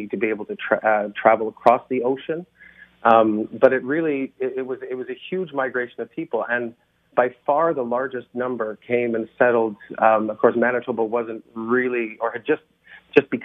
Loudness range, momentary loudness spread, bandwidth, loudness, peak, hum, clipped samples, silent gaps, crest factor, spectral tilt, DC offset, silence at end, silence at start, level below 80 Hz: 5 LU; 10 LU; 6 kHz; -22 LUFS; 0 dBFS; none; under 0.1%; none; 22 dB; -8 dB/octave; under 0.1%; 0 s; 0 s; -68 dBFS